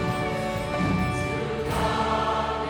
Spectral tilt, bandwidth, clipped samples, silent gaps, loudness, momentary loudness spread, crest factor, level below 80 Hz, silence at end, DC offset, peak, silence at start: -6 dB/octave; 19 kHz; under 0.1%; none; -26 LUFS; 4 LU; 14 dB; -40 dBFS; 0 s; under 0.1%; -12 dBFS; 0 s